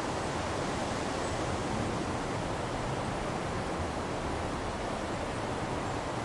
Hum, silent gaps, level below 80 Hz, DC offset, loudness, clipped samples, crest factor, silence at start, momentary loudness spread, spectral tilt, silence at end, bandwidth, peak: none; none; -46 dBFS; under 0.1%; -34 LUFS; under 0.1%; 14 dB; 0 s; 2 LU; -5 dB/octave; 0 s; 11.5 kHz; -20 dBFS